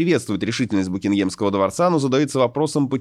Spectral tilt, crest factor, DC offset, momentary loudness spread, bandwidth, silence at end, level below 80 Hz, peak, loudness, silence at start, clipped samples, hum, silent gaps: -6 dB/octave; 14 dB; under 0.1%; 3 LU; 13 kHz; 0 s; -58 dBFS; -6 dBFS; -20 LUFS; 0 s; under 0.1%; none; none